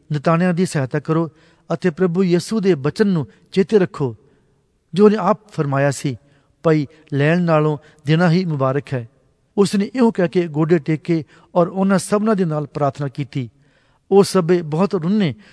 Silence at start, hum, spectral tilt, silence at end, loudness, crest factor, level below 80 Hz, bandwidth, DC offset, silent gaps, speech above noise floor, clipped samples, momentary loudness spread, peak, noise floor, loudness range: 0.1 s; none; -7 dB/octave; 0.2 s; -18 LUFS; 18 dB; -60 dBFS; 11 kHz; under 0.1%; none; 43 dB; under 0.1%; 10 LU; 0 dBFS; -61 dBFS; 1 LU